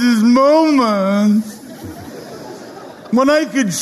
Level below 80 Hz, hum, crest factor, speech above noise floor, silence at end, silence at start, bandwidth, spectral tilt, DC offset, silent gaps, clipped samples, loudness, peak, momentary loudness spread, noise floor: -56 dBFS; none; 12 dB; 21 dB; 0 s; 0 s; 13.5 kHz; -5 dB/octave; under 0.1%; none; under 0.1%; -13 LUFS; -2 dBFS; 21 LU; -34 dBFS